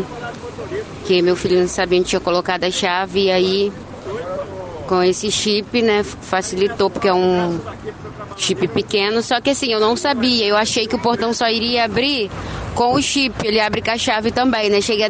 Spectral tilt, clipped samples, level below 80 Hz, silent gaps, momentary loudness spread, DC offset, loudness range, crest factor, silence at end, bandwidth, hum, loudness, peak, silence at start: -3.5 dB/octave; under 0.1%; -44 dBFS; none; 12 LU; under 0.1%; 2 LU; 16 dB; 0 s; 9.6 kHz; none; -18 LUFS; -2 dBFS; 0 s